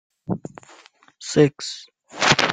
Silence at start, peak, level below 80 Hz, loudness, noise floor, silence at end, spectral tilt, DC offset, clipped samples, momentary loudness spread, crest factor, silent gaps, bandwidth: 0.3 s; 0 dBFS; -56 dBFS; -21 LUFS; -51 dBFS; 0 s; -4 dB/octave; under 0.1%; under 0.1%; 20 LU; 22 dB; none; 9.6 kHz